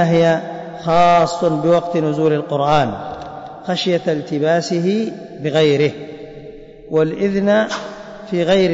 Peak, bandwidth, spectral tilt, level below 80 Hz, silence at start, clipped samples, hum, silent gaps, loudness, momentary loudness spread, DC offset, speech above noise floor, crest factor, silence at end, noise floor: -4 dBFS; 8 kHz; -6 dB/octave; -50 dBFS; 0 s; under 0.1%; none; none; -17 LUFS; 17 LU; under 0.1%; 21 dB; 12 dB; 0 s; -36 dBFS